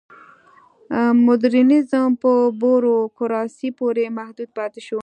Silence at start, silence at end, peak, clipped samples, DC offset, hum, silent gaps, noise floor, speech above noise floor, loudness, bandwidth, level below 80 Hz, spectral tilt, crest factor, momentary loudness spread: 0.9 s; 0 s; -4 dBFS; under 0.1%; under 0.1%; none; none; -51 dBFS; 34 dB; -18 LUFS; 8.8 kHz; -68 dBFS; -7 dB/octave; 14 dB; 13 LU